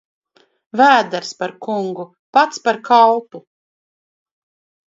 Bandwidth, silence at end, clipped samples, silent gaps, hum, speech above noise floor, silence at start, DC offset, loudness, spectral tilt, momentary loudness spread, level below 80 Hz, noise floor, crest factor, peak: 7.8 kHz; 1.55 s; under 0.1%; 2.19-2.33 s; none; over 75 dB; 0.75 s; under 0.1%; -16 LUFS; -4 dB/octave; 14 LU; -72 dBFS; under -90 dBFS; 18 dB; 0 dBFS